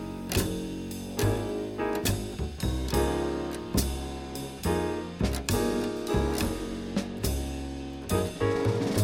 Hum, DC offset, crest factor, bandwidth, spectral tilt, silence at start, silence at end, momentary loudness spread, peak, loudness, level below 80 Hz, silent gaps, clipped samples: none; under 0.1%; 20 dB; 17 kHz; -5.5 dB/octave; 0 s; 0 s; 8 LU; -10 dBFS; -30 LUFS; -38 dBFS; none; under 0.1%